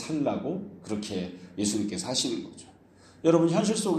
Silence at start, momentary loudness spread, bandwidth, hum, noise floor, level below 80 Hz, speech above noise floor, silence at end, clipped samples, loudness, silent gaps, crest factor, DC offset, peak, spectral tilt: 0 s; 13 LU; 13.5 kHz; none; -55 dBFS; -66 dBFS; 27 dB; 0 s; under 0.1%; -28 LUFS; none; 20 dB; under 0.1%; -8 dBFS; -5 dB/octave